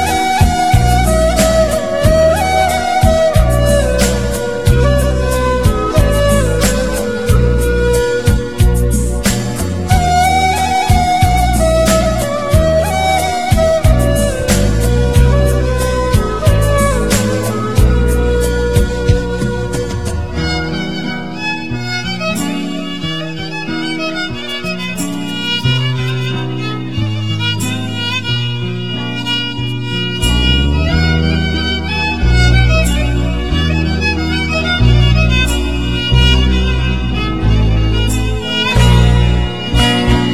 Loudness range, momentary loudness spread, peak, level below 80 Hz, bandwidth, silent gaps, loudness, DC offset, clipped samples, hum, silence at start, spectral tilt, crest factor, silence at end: 6 LU; 8 LU; 0 dBFS; -18 dBFS; 16 kHz; none; -14 LUFS; 3%; under 0.1%; none; 0 s; -5 dB/octave; 12 dB; 0 s